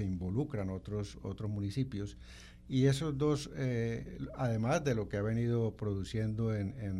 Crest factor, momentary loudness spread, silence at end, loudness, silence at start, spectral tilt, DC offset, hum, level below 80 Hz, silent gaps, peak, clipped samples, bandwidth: 18 dB; 10 LU; 0 s; -35 LUFS; 0 s; -7 dB/octave; under 0.1%; none; -54 dBFS; none; -16 dBFS; under 0.1%; 12.5 kHz